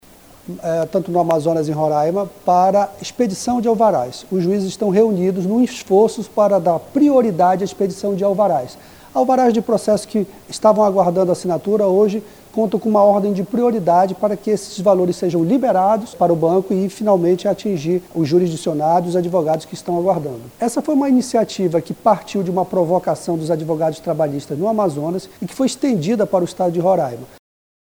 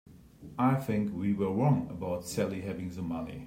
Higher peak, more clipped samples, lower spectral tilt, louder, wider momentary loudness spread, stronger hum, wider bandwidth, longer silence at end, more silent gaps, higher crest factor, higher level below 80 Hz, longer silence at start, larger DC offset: first, 0 dBFS vs -14 dBFS; neither; about the same, -6.5 dB/octave vs -7.5 dB/octave; first, -17 LUFS vs -31 LUFS; about the same, 7 LU vs 9 LU; neither; first, over 20 kHz vs 16 kHz; first, 0.65 s vs 0 s; neither; about the same, 16 dB vs 18 dB; about the same, -56 dBFS vs -60 dBFS; first, 0.5 s vs 0.1 s; neither